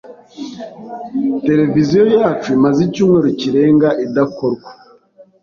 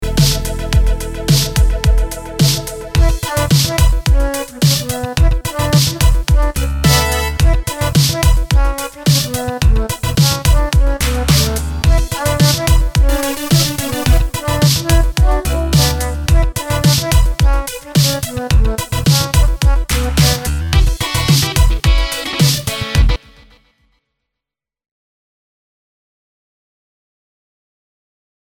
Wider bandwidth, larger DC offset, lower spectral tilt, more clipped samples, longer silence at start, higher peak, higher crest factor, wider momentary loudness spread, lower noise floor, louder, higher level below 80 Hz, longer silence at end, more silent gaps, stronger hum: second, 7.2 kHz vs 19 kHz; neither; first, -7.5 dB/octave vs -4.5 dB/octave; neither; about the same, 0.05 s vs 0 s; about the same, -2 dBFS vs 0 dBFS; about the same, 12 dB vs 14 dB; first, 18 LU vs 5 LU; second, -46 dBFS vs -85 dBFS; about the same, -14 LUFS vs -14 LUFS; second, -52 dBFS vs -16 dBFS; second, 0.7 s vs 5.45 s; neither; neither